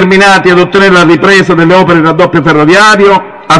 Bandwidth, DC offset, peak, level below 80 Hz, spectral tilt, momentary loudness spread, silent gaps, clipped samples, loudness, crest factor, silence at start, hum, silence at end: 12 kHz; 1%; 0 dBFS; -38 dBFS; -5 dB/octave; 3 LU; none; 7%; -4 LUFS; 4 dB; 0 s; none; 0 s